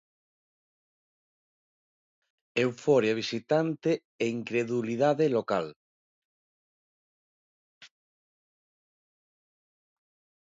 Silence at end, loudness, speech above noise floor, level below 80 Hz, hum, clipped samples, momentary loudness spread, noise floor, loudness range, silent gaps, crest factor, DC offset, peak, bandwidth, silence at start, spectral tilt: 2.6 s; -28 LUFS; over 63 dB; -78 dBFS; none; under 0.1%; 7 LU; under -90 dBFS; 6 LU; 4.05-4.19 s, 5.76-7.81 s; 22 dB; under 0.1%; -10 dBFS; 7.8 kHz; 2.55 s; -6 dB/octave